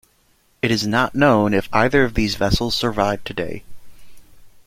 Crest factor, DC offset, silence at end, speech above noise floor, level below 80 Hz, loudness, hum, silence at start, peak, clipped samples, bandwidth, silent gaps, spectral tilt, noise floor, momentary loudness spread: 18 dB; under 0.1%; 0.05 s; 41 dB; -36 dBFS; -19 LUFS; none; 0.65 s; -2 dBFS; under 0.1%; 16.5 kHz; none; -5 dB/octave; -59 dBFS; 11 LU